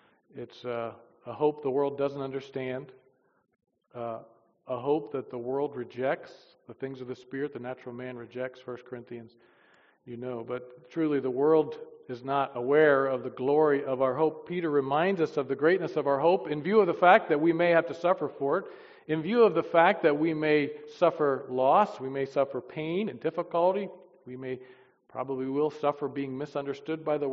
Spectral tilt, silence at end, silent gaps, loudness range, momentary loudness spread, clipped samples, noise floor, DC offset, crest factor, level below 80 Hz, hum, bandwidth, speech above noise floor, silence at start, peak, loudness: -4.5 dB/octave; 0 s; none; 12 LU; 17 LU; under 0.1%; -63 dBFS; under 0.1%; 22 dB; -76 dBFS; none; 6.6 kHz; 35 dB; 0.35 s; -6 dBFS; -28 LUFS